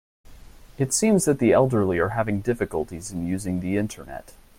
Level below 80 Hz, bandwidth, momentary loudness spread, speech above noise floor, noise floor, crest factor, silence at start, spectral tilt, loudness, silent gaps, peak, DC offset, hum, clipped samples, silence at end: -48 dBFS; 16.5 kHz; 12 LU; 22 dB; -45 dBFS; 18 dB; 0.3 s; -5.5 dB/octave; -23 LUFS; none; -6 dBFS; under 0.1%; none; under 0.1%; 0.4 s